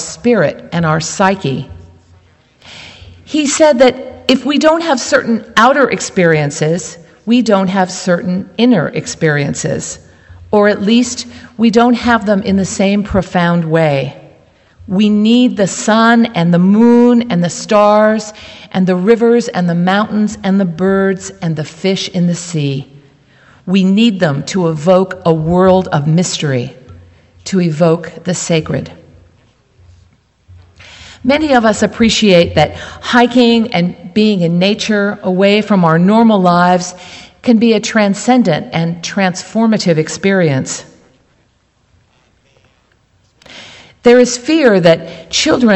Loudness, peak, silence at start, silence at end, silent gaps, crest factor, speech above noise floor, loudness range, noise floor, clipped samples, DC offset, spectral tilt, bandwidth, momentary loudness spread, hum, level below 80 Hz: -12 LUFS; 0 dBFS; 0 s; 0 s; none; 12 dB; 44 dB; 6 LU; -56 dBFS; 0.1%; under 0.1%; -5.5 dB/octave; 8.4 kHz; 11 LU; none; -44 dBFS